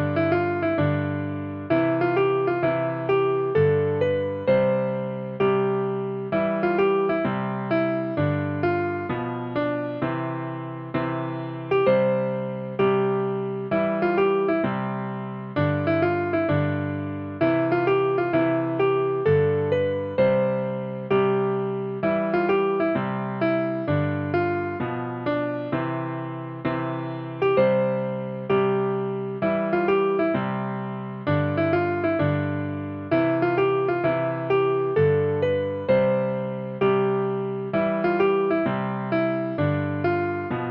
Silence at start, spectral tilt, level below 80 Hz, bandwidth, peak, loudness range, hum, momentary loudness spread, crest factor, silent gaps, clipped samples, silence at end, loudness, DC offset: 0 s; -10 dB/octave; -60 dBFS; 5.4 kHz; -8 dBFS; 3 LU; none; 8 LU; 14 dB; none; under 0.1%; 0 s; -24 LUFS; under 0.1%